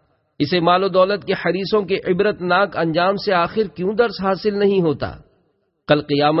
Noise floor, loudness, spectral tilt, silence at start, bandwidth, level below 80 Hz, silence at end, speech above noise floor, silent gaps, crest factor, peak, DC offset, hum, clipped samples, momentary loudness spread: -65 dBFS; -18 LUFS; -9.5 dB/octave; 0.4 s; 5.8 kHz; -50 dBFS; 0 s; 47 dB; none; 16 dB; -2 dBFS; under 0.1%; none; under 0.1%; 6 LU